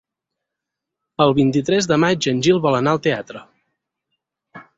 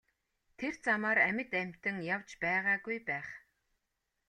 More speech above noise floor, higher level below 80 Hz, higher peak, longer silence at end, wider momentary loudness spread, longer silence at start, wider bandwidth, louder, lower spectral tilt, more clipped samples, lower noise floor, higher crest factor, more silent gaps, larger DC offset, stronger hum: first, 66 dB vs 50 dB; first, -56 dBFS vs -74 dBFS; first, -2 dBFS vs -16 dBFS; second, 0.15 s vs 0.9 s; first, 15 LU vs 12 LU; first, 1.2 s vs 0.6 s; second, 8 kHz vs 10.5 kHz; first, -17 LUFS vs -33 LUFS; about the same, -5.5 dB/octave vs -5.5 dB/octave; neither; about the same, -83 dBFS vs -84 dBFS; about the same, 18 dB vs 20 dB; neither; neither; neither